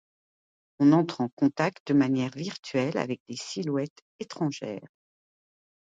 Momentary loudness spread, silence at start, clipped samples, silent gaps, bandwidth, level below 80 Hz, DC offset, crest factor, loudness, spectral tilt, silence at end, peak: 16 LU; 0.8 s; under 0.1%; 1.32-1.37 s, 1.80-1.86 s, 2.59-2.63 s, 3.20-3.26 s, 3.90-3.96 s, 4.02-4.19 s; 7.8 kHz; -72 dBFS; under 0.1%; 18 dB; -27 LUFS; -6.5 dB/octave; 1 s; -10 dBFS